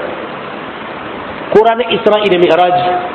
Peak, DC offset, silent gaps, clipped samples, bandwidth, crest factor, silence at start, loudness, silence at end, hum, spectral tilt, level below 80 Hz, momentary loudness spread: 0 dBFS; under 0.1%; none; 0.5%; 7.4 kHz; 12 dB; 0 s; -11 LUFS; 0 s; none; -6.5 dB/octave; -48 dBFS; 15 LU